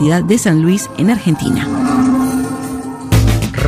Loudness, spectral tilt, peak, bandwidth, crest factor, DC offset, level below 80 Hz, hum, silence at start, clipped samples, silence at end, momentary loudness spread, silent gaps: -14 LUFS; -6 dB/octave; -2 dBFS; 15 kHz; 12 dB; under 0.1%; -26 dBFS; none; 0 s; under 0.1%; 0 s; 8 LU; none